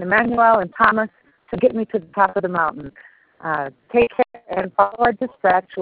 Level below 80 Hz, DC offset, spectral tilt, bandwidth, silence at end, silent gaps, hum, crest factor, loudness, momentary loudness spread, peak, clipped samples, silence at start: -52 dBFS; under 0.1%; -4 dB/octave; 4.8 kHz; 0 s; none; none; 18 dB; -19 LUFS; 11 LU; -2 dBFS; under 0.1%; 0 s